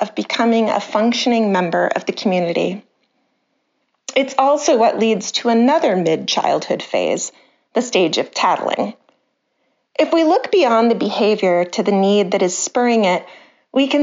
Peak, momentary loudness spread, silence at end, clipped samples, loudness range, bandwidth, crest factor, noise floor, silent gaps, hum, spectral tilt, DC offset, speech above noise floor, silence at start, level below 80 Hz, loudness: 0 dBFS; 7 LU; 0 s; under 0.1%; 4 LU; 7.6 kHz; 16 dB; -68 dBFS; none; none; -3.5 dB/octave; under 0.1%; 52 dB; 0 s; -72 dBFS; -17 LUFS